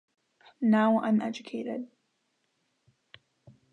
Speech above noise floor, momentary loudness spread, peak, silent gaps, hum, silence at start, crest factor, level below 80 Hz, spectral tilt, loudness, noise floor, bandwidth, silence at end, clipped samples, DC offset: 50 dB; 15 LU; -14 dBFS; none; none; 0.6 s; 18 dB; -80 dBFS; -7 dB/octave; -28 LUFS; -76 dBFS; 6.8 kHz; 1.85 s; under 0.1%; under 0.1%